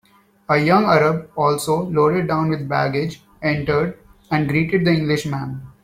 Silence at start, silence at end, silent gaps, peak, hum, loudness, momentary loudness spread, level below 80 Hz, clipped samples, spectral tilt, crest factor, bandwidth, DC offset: 0.5 s; 0.15 s; none; -2 dBFS; none; -19 LUFS; 10 LU; -50 dBFS; under 0.1%; -6.5 dB/octave; 16 dB; 15.5 kHz; under 0.1%